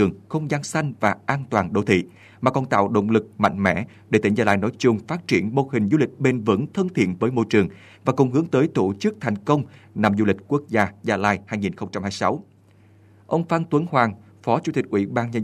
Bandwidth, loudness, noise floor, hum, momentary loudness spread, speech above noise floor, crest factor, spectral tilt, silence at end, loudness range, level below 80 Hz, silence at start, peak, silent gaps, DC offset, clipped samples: 12 kHz; -22 LUFS; -53 dBFS; none; 6 LU; 31 dB; 20 dB; -6.5 dB/octave; 0 s; 3 LU; -58 dBFS; 0 s; -2 dBFS; none; under 0.1%; under 0.1%